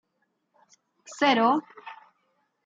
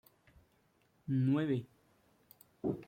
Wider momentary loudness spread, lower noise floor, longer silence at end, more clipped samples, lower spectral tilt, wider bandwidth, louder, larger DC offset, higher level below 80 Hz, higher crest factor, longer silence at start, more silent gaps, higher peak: first, 24 LU vs 10 LU; about the same, -76 dBFS vs -73 dBFS; first, 0.7 s vs 0.05 s; neither; second, -3.5 dB/octave vs -9.5 dB/octave; second, 9 kHz vs 16.5 kHz; first, -23 LUFS vs -35 LUFS; neither; second, -86 dBFS vs -72 dBFS; first, 22 dB vs 16 dB; about the same, 1.1 s vs 1.05 s; neither; first, -8 dBFS vs -22 dBFS